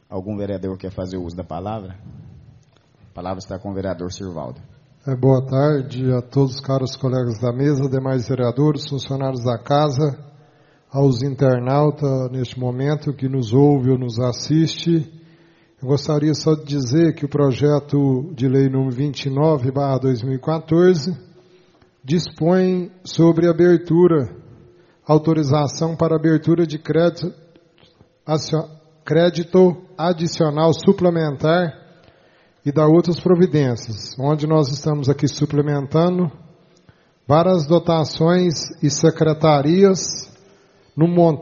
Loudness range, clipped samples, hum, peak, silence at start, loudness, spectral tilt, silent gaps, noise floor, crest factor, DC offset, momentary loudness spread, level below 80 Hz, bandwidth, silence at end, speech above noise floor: 4 LU; under 0.1%; none; 0 dBFS; 0.1 s; -18 LUFS; -7 dB/octave; none; -54 dBFS; 18 dB; under 0.1%; 13 LU; -54 dBFS; 7.2 kHz; 0 s; 37 dB